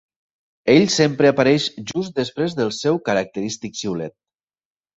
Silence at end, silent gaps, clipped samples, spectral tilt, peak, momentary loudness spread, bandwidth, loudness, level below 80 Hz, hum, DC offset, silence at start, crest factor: 0.85 s; none; under 0.1%; -5 dB/octave; -2 dBFS; 12 LU; 8.2 kHz; -19 LUFS; -58 dBFS; none; under 0.1%; 0.65 s; 18 dB